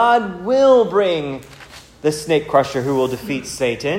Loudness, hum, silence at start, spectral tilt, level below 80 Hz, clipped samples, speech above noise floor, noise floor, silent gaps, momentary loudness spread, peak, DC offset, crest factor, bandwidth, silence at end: -17 LUFS; none; 0 s; -5 dB/octave; -50 dBFS; under 0.1%; 24 dB; -41 dBFS; none; 12 LU; 0 dBFS; under 0.1%; 16 dB; 16 kHz; 0 s